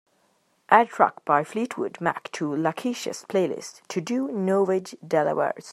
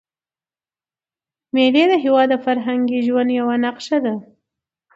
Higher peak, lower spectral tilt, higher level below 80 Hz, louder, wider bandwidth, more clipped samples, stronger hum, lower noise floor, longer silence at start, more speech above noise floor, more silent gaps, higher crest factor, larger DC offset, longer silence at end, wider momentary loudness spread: about the same, -2 dBFS vs -2 dBFS; about the same, -5.5 dB/octave vs -5 dB/octave; second, -76 dBFS vs -70 dBFS; second, -25 LUFS vs -17 LUFS; first, 13.5 kHz vs 7.8 kHz; neither; neither; second, -67 dBFS vs under -90 dBFS; second, 0.7 s vs 1.55 s; second, 43 dB vs over 73 dB; neither; first, 24 dB vs 18 dB; neither; second, 0 s vs 0.75 s; first, 10 LU vs 7 LU